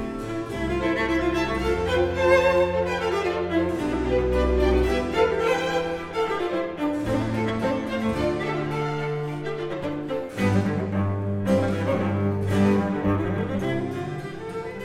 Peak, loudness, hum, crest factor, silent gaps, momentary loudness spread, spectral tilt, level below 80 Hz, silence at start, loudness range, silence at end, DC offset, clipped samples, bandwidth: -6 dBFS; -24 LUFS; none; 18 dB; none; 9 LU; -7 dB/octave; -38 dBFS; 0 s; 4 LU; 0 s; under 0.1%; under 0.1%; 15.5 kHz